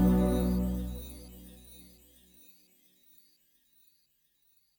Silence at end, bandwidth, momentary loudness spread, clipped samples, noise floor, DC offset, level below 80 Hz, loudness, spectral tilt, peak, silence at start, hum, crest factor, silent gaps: 3 s; over 20 kHz; 28 LU; under 0.1%; -72 dBFS; under 0.1%; -40 dBFS; -31 LUFS; -8 dB/octave; -14 dBFS; 0 s; none; 20 dB; none